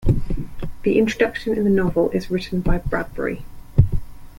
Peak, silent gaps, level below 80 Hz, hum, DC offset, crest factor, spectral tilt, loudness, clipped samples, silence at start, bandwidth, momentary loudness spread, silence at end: -2 dBFS; none; -28 dBFS; none; under 0.1%; 18 dB; -7.5 dB/octave; -22 LUFS; under 0.1%; 0 s; 16.5 kHz; 12 LU; 0.05 s